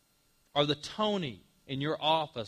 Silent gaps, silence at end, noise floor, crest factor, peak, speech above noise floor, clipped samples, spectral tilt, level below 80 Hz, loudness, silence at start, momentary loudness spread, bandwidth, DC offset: none; 0 s; -70 dBFS; 20 dB; -12 dBFS; 38 dB; under 0.1%; -5 dB/octave; -68 dBFS; -32 LUFS; 0.55 s; 9 LU; 14.5 kHz; under 0.1%